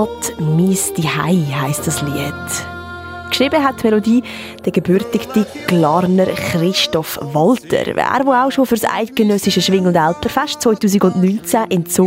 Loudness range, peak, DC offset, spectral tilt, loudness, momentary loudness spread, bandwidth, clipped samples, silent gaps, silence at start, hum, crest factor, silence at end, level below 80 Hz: 3 LU; 0 dBFS; under 0.1%; -5 dB/octave; -15 LUFS; 7 LU; 16.5 kHz; under 0.1%; none; 0 s; none; 14 dB; 0 s; -48 dBFS